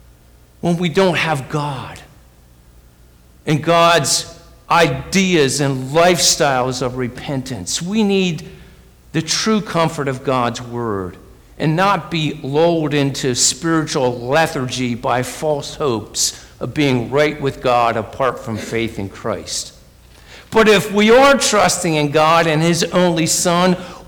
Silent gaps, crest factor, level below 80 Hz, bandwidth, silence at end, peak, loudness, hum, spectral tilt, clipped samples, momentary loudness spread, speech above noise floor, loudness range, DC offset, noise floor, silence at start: none; 12 dB; -44 dBFS; over 20 kHz; 0.05 s; -4 dBFS; -16 LUFS; none; -4 dB/octave; under 0.1%; 12 LU; 31 dB; 6 LU; under 0.1%; -47 dBFS; 0.65 s